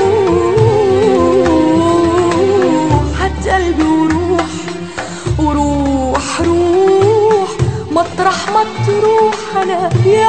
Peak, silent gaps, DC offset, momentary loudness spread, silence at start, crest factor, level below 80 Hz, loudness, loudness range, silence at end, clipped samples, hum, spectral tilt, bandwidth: 0 dBFS; none; 1%; 6 LU; 0 s; 12 dB; -28 dBFS; -12 LUFS; 3 LU; 0 s; under 0.1%; none; -6.5 dB/octave; 9.2 kHz